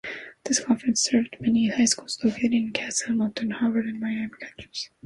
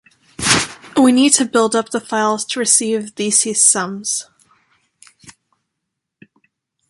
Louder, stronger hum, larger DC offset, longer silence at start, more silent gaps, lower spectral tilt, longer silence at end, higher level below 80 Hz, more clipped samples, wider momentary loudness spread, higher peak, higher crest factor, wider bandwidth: second, -25 LUFS vs -15 LUFS; neither; neither; second, 0.05 s vs 0.4 s; neither; about the same, -3 dB/octave vs -2 dB/octave; second, 0.2 s vs 1.6 s; second, -60 dBFS vs -54 dBFS; neither; first, 13 LU vs 10 LU; second, -8 dBFS vs 0 dBFS; about the same, 18 dB vs 18 dB; about the same, 11.5 kHz vs 12 kHz